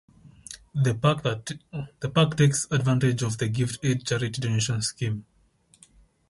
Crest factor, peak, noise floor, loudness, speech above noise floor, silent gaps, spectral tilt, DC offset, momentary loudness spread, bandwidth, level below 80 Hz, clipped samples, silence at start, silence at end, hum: 18 dB; -8 dBFS; -62 dBFS; -26 LUFS; 37 dB; none; -5 dB/octave; under 0.1%; 14 LU; 11.5 kHz; -56 dBFS; under 0.1%; 0.25 s; 1.1 s; none